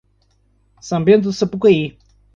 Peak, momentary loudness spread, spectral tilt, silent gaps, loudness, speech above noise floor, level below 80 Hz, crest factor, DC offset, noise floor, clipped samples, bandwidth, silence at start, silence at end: -2 dBFS; 9 LU; -6.5 dB/octave; none; -16 LUFS; 44 dB; -52 dBFS; 16 dB; under 0.1%; -59 dBFS; under 0.1%; 7.6 kHz; 0.85 s; 0.45 s